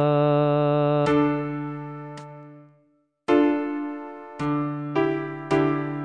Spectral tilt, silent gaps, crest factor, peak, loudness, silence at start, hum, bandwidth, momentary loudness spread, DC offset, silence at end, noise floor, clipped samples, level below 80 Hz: -8.5 dB/octave; none; 18 dB; -6 dBFS; -23 LUFS; 0 s; none; 9.2 kHz; 17 LU; under 0.1%; 0 s; -65 dBFS; under 0.1%; -58 dBFS